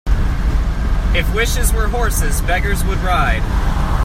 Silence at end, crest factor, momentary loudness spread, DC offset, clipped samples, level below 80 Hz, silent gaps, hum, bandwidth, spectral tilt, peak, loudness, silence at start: 0 s; 14 dB; 3 LU; under 0.1%; under 0.1%; -16 dBFS; none; none; 16 kHz; -4.5 dB/octave; -2 dBFS; -18 LUFS; 0.05 s